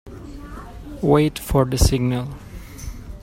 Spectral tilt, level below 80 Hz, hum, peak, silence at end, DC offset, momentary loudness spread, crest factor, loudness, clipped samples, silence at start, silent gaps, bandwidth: -6 dB/octave; -30 dBFS; none; -2 dBFS; 0 s; under 0.1%; 20 LU; 20 dB; -19 LUFS; under 0.1%; 0.05 s; none; 16.5 kHz